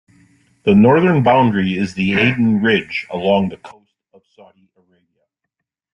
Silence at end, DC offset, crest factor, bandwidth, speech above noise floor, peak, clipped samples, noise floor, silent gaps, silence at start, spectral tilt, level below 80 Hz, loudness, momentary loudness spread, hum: 2.2 s; under 0.1%; 16 dB; 8.2 kHz; 64 dB; -2 dBFS; under 0.1%; -79 dBFS; none; 0.65 s; -7.5 dB/octave; -52 dBFS; -15 LUFS; 9 LU; none